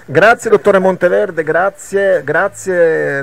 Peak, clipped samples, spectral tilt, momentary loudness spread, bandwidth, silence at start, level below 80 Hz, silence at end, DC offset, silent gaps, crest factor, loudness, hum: 0 dBFS; under 0.1%; -5.5 dB/octave; 6 LU; 15 kHz; 0.1 s; -52 dBFS; 0 s; 0.7%; none; 12 dB; -12 LUFS; none